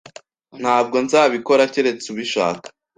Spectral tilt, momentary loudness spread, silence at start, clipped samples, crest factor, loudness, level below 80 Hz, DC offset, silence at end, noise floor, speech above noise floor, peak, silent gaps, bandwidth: -3.5 dB/octave; 10 LU; 0.55 s; under 0.1%; 18 dB; -18 LUFS; -66 dBFS; under 0.1%; 0.3 s; -44 dBFS; 26 dB; -2 dBFS; none; 9.6 kHz